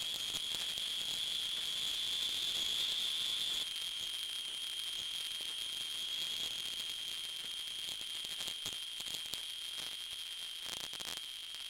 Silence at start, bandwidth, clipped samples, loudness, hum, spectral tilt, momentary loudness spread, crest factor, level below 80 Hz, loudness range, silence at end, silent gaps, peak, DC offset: 0 s; 17 kHz; under 0.1%; -37 LUFS; none; 1.5 dB/octave; 7 LU; 26 dB; -72 dBFS; 5 LU; 0 s; none; -14 dBFS; under 0.1%